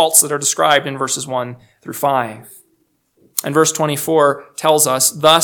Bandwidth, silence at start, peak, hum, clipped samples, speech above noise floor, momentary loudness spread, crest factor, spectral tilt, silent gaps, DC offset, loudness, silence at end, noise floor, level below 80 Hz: over 20 kHz; 0 s; 0 dBFS; none; 0.1%; 47 dB; 12 LU; 16 dB; -2 dB/octave; none; under 0.1%; -15 LUFS; 0 s; -62 dBFS; -66 dBFS